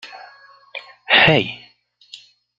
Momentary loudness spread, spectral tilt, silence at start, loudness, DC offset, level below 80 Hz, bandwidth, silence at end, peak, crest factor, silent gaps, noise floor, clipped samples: 25 LU; -5.5 dB/octave; 0.05 s; -14 LUFS; under 0.1%; -52 dBFS; 7.8 kHz; 1 s; -2 dBFS; 20 dB; none; -48 dBFS; under 0.1%